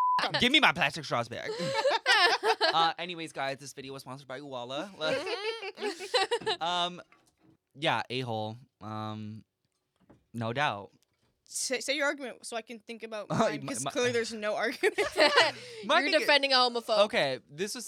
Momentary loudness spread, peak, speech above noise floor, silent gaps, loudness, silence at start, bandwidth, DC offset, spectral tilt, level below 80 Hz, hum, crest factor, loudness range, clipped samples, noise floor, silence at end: 18 LU; -8 dBFS; 48 dB; none; -28 LUFS; 0 s; 17.5 kHz; under 0.1%; -3 dB/octave; -70 dBFS; none; 22 dB; 10 LU; under 0.1%; -78 dBFS; 0 s